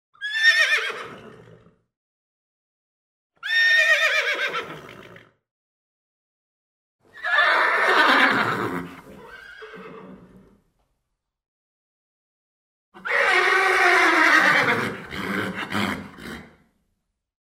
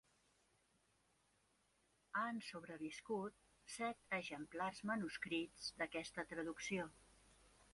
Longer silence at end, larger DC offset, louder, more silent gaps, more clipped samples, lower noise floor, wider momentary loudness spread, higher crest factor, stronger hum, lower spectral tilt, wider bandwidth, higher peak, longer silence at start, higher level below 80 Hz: first, 1.05 s vs 0.1 s; neither; first, -19 LUFS vs -46 LUFS; first, 1.97-3.30 s, 5.51-6.99 s, 11.48-12.92 s vs none; neither; about the same, -79 dBFS vs -80 dBFS; first, 23 LU vs 7 LU; about the same, 20 dB vs 20 dB; neither; second, -2.5 dB/octave vs -4 dB/octave; first, 16 kHz vs 11.5 kHz; first, -4 dBFS vs -28 dBFS; second, 0.2 s vs 2.15 s; first, -62 dBFS vs -78 dBFS